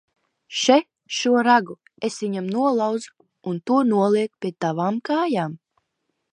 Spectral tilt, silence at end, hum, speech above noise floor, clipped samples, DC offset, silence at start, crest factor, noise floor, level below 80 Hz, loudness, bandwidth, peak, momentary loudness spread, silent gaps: -4.5 dB/octave; 0.75 s; none; 55 dB; under 0.1%; under 0.1%; 0.5 s; 20 dB; -76 dBFS; -76 dBFS; -22 LUFS; 10.5 kHz; -2 dBFS; 12 LU; none